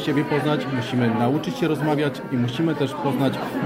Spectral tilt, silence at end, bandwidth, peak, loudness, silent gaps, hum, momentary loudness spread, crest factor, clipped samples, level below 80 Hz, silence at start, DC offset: -7 dB/octave; 0 s; 16 kHz; -8 dBFS; -23 LUFS; none; none; 3 LU; 14 dB; under 0.1%; -58 dBFS; 0 s; under 0.1%